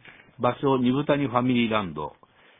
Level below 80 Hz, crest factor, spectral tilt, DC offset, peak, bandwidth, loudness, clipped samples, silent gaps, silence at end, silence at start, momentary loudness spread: -56 dBFS; 20 dB; -10.5 dB/octave; under 0.1%; -6 dBFS; 3.9 kHz; -24 LUFS; under 0.1%; none; 0.5 s; 0.05 s; 11 LU